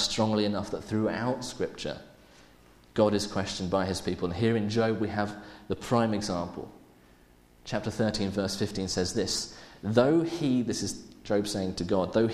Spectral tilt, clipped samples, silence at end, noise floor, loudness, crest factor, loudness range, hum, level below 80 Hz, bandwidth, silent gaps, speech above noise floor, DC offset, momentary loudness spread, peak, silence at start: -5 dB/octave; under 0.1%; 0 s; -58 dBFS; -29 LUFS; 22 dB; 4 LU; none; -54 dBFS; 14.5 kHz; none; 30 dB; under 0.1%; 12 LU; -6 dBFS; 0 s